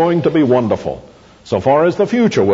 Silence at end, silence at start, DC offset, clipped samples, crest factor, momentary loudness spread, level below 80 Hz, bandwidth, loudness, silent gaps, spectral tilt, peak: 0 s; 0 s; under 0.1%; under 0.1%; 12 dB; 9 LU; -48 dBFS; 7.8 kHz; -14 LUFS; none; -7 dB/octave; -2 dBFS